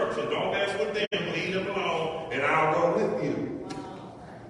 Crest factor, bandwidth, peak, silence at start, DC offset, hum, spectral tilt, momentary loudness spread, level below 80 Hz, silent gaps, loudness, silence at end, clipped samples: 16 dB; 11.5 kHz; -12 dBFS; 0 s; under 0.1%; none; -5 dB/octave; 14 LU; -60 dBFS; 1.07-1.11 s; -28 LUFS; 0 s; under 0.1%